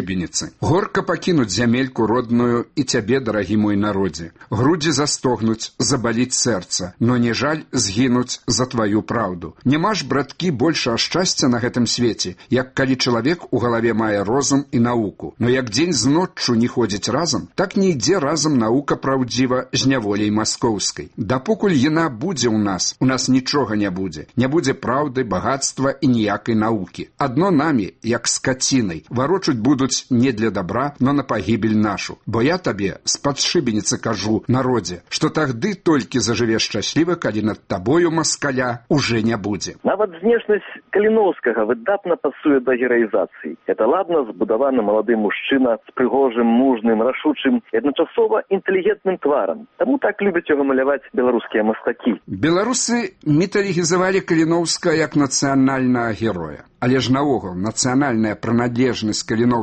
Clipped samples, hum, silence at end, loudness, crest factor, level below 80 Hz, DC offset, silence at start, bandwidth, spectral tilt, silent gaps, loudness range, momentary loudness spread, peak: under 0.1%; none; 0 s; -19 LUFS; 14 dB; -50 dBFS; under 0.1%; 0 s; 8.8 kHz; -4.5 dB/octave; none; 2 LU; 5 LU; -4 dBFS